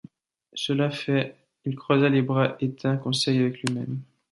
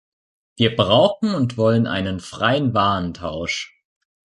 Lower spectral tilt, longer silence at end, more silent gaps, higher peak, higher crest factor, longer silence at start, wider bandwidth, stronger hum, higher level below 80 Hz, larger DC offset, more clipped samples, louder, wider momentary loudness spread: about the same, -6 dB/octave vs -6 dB/octave; second, 0.3 s vs 0.65 s; neither; second, -6 dBFS vs -2 dBFS; about the same, 18 dB vs 18 dB; about the same, 0.55 s vs 0.6 s; about the same, 11.5 kHz vs 11.5 kHz; neither; second, -68 dBFS vs -46 dBFS; neither; neither; second, -25 LUFS vs -19 LUFS; about the same, 13 LU vs 11 LU